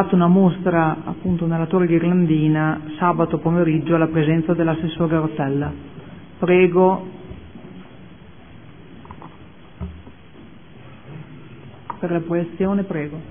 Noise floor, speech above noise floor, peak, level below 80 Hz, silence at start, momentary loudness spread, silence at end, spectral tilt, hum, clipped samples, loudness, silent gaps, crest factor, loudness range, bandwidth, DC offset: -44 dBFS; 26 dB; -2 dBFS; -48 dBFS; 0 s; 24 LU; 0 s; -12.5 dB/octave; none; under 0.1%; -19 LUFS; none; 18 dB; 22 LU; 3.6 kHz; 0.5%